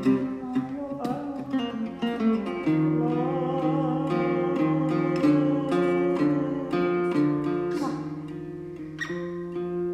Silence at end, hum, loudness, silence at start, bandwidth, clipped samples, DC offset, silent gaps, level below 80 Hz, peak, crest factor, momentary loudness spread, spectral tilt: 0 s; none; -26 LUFS; 0 s; 9.6 kHz; under 0.1%; under 0.1%; none; -60 dBFS; -10 dBFS; 14 dB; 10 LU; -8 dB/octave